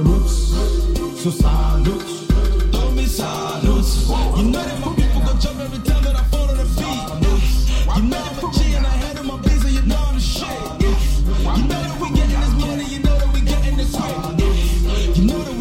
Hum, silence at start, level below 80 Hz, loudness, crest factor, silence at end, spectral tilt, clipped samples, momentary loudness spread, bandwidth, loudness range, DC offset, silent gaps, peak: none; 0 s; -18 dBFS; -19 LUFS; 14 dB; 0 s; -5.5 dB/octave; under 0.1%; 4 LU; 15.5 kHz; 1 LU; under 0.1%; none; -2 dBFS